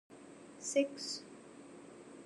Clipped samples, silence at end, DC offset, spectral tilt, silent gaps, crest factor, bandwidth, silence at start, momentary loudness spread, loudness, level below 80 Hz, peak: under 0.1%; 0 s; under 0.1%; -2 dB/octave; none; 22 dB; 12.5 kHz; 0.1 s; 20 LU; -38 LUFS; -84 dBFS; -20 dBFS